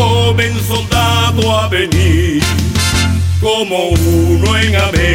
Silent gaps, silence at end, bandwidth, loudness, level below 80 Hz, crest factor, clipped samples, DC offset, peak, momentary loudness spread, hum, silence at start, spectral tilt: none; 0 s; 16.5 kHz; -12 LUFS; -22 dBFS; 10 dB; under 0.1%; under 0.1%; 0 dBFS; 3 LU; none; 0 s; -5 dB/octave